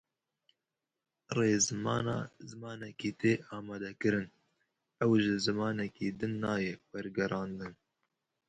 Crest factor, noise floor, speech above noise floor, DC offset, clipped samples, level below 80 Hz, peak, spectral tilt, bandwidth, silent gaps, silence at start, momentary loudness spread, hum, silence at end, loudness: 20 dB; -89 dBFS; 55 dB; under 0.1%; under 0.1%; -66 dBFS; -16 dBFS; -4.5 dB/octave; 9.6 kHz; none; 1.3 s; 16 LU; none; 0.75 s; -33 LUFS